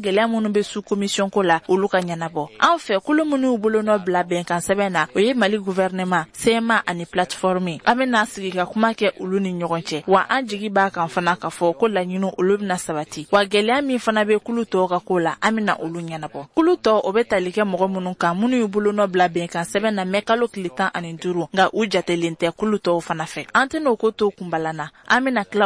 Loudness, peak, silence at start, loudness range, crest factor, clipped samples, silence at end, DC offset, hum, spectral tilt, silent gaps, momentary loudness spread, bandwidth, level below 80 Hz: -20 LUFS; -2 dBFS; 0 s; 2 LU; 18 dB; under 0.1%; 0 s; under 0.1%; none; -5 dB/octave; none; 7 LU; 11 kHz; -58 dBFS